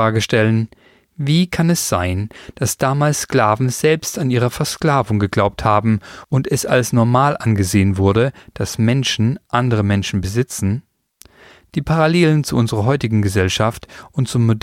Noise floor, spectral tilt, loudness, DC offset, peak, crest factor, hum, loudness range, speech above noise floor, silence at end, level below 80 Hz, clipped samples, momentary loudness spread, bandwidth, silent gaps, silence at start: -50 dBFS; -5.5 dB/octave; -17 LUFS; under 0.1%; -2 dBFS; 16 dB; none; 2 LU; 33 dB; 0.05 s; -42 dBFS; under 0.1%; 7 LU; 16.5 kHz; none; 0 s